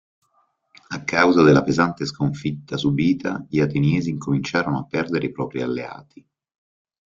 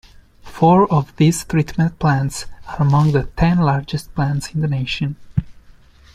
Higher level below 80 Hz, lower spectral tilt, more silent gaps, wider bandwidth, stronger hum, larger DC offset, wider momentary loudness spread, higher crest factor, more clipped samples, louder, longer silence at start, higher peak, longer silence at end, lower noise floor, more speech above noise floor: second, -54 dBFS vs -36 dBFS; about the same, -6.5 dB/octave vs -6.5 dB/octave; neither; second, 7.6 kHz vs 14 kHz; neither; neither; about the same, 13 LU vs 11 LU; about the same, 20 dB vs 16 dB; neither; second, -21 LUFS vs -18 LUFS; first, 0.9 s vs 0.45 s; about the same, -2 dBFS vs -2 dBFS; first, 1.15 s vs 0.55 s; first, -66 dBFS vs -45 dBFS; first, 46 dB vs 29 dB